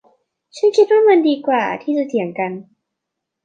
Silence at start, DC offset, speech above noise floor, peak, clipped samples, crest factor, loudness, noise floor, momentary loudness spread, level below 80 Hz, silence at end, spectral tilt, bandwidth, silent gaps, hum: 0.55 s; under 0.1%; 64 dB; -2 dBFS; under 0.1%; 16 dB; -16 LUFS; -80 dBFS; 12 LU; -74 dBFS; 0.85 s; -5.5 dB/octave; 8.6 kHz; none; none